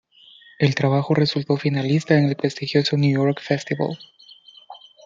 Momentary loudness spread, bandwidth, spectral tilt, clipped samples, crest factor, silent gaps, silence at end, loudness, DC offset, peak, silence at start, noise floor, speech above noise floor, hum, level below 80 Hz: 7 LU; 7.6 kHz; -7 dB/octave; under 0.1%; 18 dB; none; 0.3 s; -21 LUFS; under 0.1%; -4 dBFS; 0.6 s; -50 dBFS; 30 dB; none; -64 dBFS